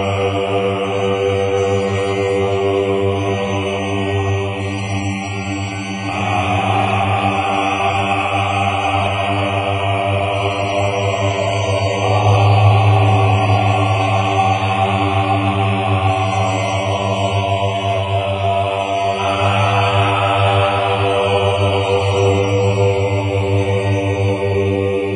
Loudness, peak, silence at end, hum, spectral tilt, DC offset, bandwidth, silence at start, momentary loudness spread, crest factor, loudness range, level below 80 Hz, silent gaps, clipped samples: -16 LUFS; -2 dBFS; 0 s; none; -6 dB/octave; under 0.1%; 10 kHz; 0 s; 5 LU; 14 dB; 4 LU; -46 dBFS; none; under 0.1%